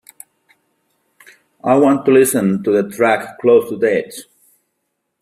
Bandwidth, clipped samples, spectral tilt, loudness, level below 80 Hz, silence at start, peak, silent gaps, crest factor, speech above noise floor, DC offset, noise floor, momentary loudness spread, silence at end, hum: 15.5 kHz; under 0.1%; -5.5 dB/octave; -15 LUFS; -62 dBFS; 1.65 s; -2 dBFS; none; 16 dB; 59 dB; under 0.1%; -72 dBFS; 10 LU; 1 s; none